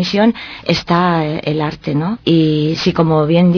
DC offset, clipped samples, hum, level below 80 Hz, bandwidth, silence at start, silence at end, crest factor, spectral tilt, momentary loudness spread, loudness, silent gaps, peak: under 0.1%; under 0.1%; none; -44 dBFS; 5.4 kHz; 0 s; 0 s; 12 dB; -7 dB/octave; 6 LU; -15 LUFS; none; -2 dBFS